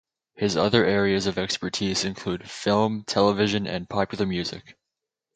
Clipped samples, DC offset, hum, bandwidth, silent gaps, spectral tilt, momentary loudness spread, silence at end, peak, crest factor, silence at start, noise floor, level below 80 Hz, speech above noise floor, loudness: under 0.1%; under 0.1%; none; 9.2 kHz; none; -4.5 dB/octave; 9 LU; 0.65 s; -4 dBFS; 22 dB; 0.4 s; -86 dBFS; -52 dBFS; 62 dB; -24 LUFS